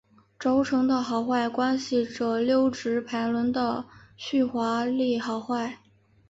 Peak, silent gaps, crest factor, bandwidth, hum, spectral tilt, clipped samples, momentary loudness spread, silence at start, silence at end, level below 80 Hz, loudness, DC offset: -12 dBFS; none; 14 dB; 8 kHz; none; -5 dB/octave; under 0.1%; 7 LU; 0.4 s; 0.55 s; -64 dBFS; -26 LUFS; under 0.1%